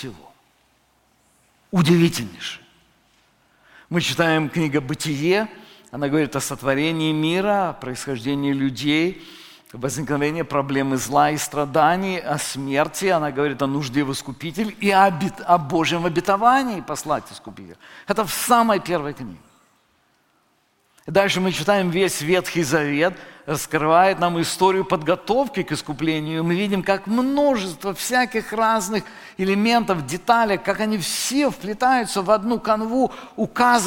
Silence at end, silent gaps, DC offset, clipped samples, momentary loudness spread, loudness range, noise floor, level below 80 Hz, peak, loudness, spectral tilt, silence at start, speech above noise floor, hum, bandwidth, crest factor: 0 s; none; under 0.1%; under 0.1%; 10 LU; 4 LU; -64 dBFS; -52 dBFS; -2 dBFS; -21 LUFS; -4.5 dB/octave; 0 s; 43 dB; none; 17 kHz; 18 dB